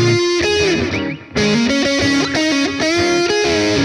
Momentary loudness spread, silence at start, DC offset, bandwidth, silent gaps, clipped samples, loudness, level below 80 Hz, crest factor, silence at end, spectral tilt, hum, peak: 4 LU; 0 s; under 0.1%; 12 kHz; none; under 0.1%; -15 LUFS; -40 dBFS; 12 dB; 0 s; -4 dB/octave; none; -2 dBFS